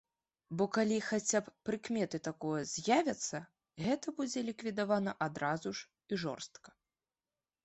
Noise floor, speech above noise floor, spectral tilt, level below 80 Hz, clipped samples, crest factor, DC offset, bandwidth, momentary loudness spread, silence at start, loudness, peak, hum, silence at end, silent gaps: under -90 dBFS; over 54 dB; -4 dB/octave; -74 dBFS; under 0.1%; 22 dB; under 0.1%; 8.2 kHz; 11 LU; 0.5 s; -36 LUFS; -16 dBFS; none; 1 s; none